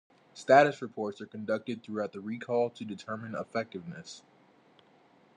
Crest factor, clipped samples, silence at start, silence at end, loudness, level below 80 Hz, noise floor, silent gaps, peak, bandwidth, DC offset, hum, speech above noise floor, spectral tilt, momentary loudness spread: 24 dB; under 0.1%; 0.35 s; 1.2 s; -31 LUFS; -84 dBFS; -62 dBFS; none; -8 dBFS; 9.8 kHz; under 0.1%; none; 32 dB; -5.5 dB/octave; 21 LU